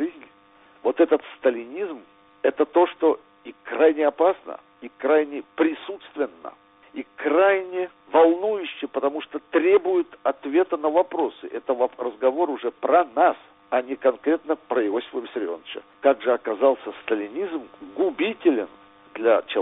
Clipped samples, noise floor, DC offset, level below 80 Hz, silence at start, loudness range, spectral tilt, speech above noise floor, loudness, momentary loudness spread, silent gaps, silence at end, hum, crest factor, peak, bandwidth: under 0.1%; -54 dBFS; under 0.1%; -70 dBFS; 0 s; 3 LU; -2 dB/octave; 32 dB; -23 LUFS; 15 LU; none; 0 s; none; 20 dB; -4 dBFS; 4 kHz